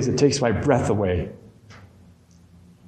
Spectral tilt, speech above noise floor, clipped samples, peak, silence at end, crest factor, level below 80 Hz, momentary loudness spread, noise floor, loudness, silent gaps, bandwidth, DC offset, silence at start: -5.5 dB/octave; 31 dB; under 0.1%; -4 dBFS; 1 s; 20 dB; -46 dBFS; 8 LU; -52 dBFS; -21 LUFS; none; 9.8 kHz; under 0.1%; 0 s